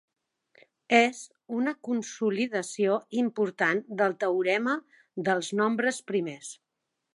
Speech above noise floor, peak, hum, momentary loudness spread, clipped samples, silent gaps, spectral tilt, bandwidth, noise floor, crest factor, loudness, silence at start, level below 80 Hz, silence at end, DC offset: 56 dB; -6 dBFS; none; 10 LU; under 0.1%; none; -4.5 dB/octave; 11.5 kHz; -83 dBFS; 22 dB; -28 LUFS; 0.9 s; -82 dBFS; 0.6 s; under 0.1%